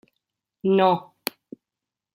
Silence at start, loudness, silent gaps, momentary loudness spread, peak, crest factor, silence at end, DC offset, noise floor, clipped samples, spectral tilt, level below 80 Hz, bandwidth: 0.65 s; -23 LUFS; none; 14 LU; -2 dBFS; 24 dB; 1.15 s; under 0.1%; -88 dBFS; under 0.1%; -6 dB/octave; -74 dBFS; 16.5 kHz